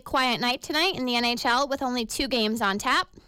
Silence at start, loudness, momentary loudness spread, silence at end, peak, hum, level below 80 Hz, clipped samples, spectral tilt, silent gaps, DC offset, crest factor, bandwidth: 0.05 s; -24 LUFS; 4 LU; 0.1 s; -14 dBFS; none; -52 dBFS; under 0.1%; -2.5 dB/octave; none; under 0.1%; 12 dB; 17 kHz